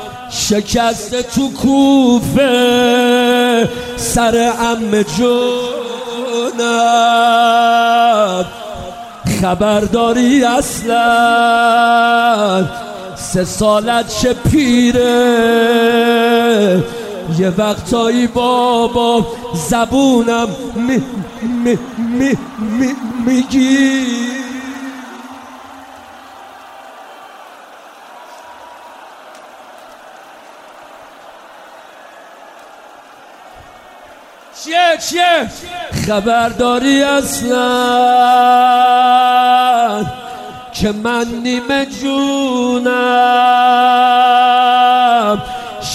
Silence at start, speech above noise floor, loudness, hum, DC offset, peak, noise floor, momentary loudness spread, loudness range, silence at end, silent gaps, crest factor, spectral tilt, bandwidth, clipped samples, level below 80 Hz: 0 s; 26 dB; -12 LUFS; none; under 0.1%; 0 dBFS; -38 dBFS; 13 LU; 6 LU; 0 s; none; 14 dB; -4 dB/octave; 15.5 kHz; under 0.1%; -40 dBFS